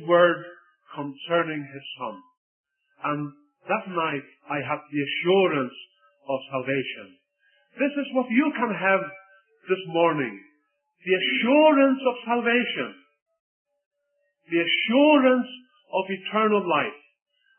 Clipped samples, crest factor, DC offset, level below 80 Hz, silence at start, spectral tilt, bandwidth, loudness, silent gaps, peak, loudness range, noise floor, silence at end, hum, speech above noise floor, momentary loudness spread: under 0.1%; 20 dB; under 0.1%; -80 dBFS; 0 s; -9.5 dB/octave; 3.4 kHz; -24 LUFS; 2.37-2.64 s, 13.22-13.26 s, 13.39-13.65 s, 13.86-13.91 s; -4 dBFS; 8 LU; -74 dBFS; 0.6 s; none; 51 dB; 17 LU